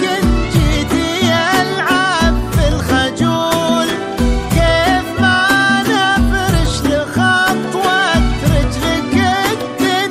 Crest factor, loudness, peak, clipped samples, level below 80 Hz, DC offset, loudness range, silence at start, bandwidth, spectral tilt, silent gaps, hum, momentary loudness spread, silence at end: 12 dB; -14 LUFS; -2 dBFS; under 0.1%; -22 dBFS; under 0.1%; 1 LU; 0 s; 16 kHz; -4.5 dB/octave; none; none; 4 LU; 0 s